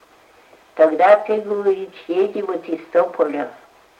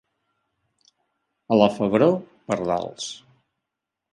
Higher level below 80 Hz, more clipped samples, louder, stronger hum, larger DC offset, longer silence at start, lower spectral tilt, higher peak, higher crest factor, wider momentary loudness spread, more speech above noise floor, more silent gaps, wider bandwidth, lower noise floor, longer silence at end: second, -72 dBFS vs -62 dBFS; neither; first, -18 LUFS vs -22 LUFS; neither; neither; second, 0.75 s vs 1.5 s; about the same, -6 dB/octave vs -6 dB/octave; about the same, -2 dBFS vs -2 dBFS; second, 18 dB vs 24 dB; about the same, 13 LU vs 14 LU; second, 33 dB vs 63 dB; neither; second, 8.6 kHz vs 11.5 kHz; second, -51 dBFS vs -84 dBFS; second, 0.45 s vs 0.95 s